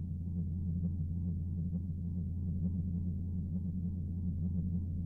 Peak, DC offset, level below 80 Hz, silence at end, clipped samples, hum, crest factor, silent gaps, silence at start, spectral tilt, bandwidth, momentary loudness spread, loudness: -26 dBFS; under 0.1%; -50 dBFS; 0 s; under 0.1%; none; 10 dB; none; 0 s; -13.5 dB/octave; 1 kHz; 2 LU; -38 LUFS